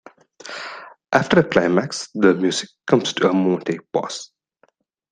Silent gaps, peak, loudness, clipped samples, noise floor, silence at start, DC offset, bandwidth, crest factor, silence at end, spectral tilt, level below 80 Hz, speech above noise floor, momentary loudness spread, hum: none; 0 dBFS; -19 LUFS; under 0.1%; -62 dBFS; 0.45 s; under 0.1%; 10 kHz; 20 dB; 0.85 s; -5 dB/octave; -58 dBFS; 43 dB; 16 LU; none